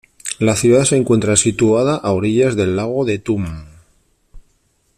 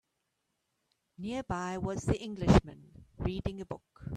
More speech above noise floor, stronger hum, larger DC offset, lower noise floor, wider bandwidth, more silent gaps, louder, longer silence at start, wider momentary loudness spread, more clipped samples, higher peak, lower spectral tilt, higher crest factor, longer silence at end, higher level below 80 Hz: second, 46 dB vs 50 dB; neither; neither; second, -61 dBFS vs -82 dBFS; first, 14.5 kHz vs 11 kHz; neither; first, -15 LUFS vs -32 LUFS; second, 0.25 s vs 1.2 s; second, 9 LU vs 18 LU; neither; first, 0 dBFS vs -10 dBFS; second, -5 dB/octave vs -7 dB/octave; second, 16 dB vs 24 dB; first, 0.6 s vs 0 s; about the same, -44 dBFS vs -44 dBFS